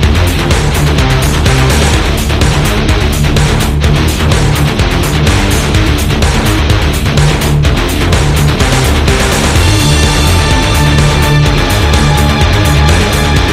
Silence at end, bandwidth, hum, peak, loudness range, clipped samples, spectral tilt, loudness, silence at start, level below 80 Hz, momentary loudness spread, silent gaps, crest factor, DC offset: 0 s; 16 kHz; none; 0 dBFS; 2 LU; 0.3%; -4.5 dB/octave; -9 LUFS; 0 s; -14 dBFS; 2 LU; none; 8 dB; under 0.1%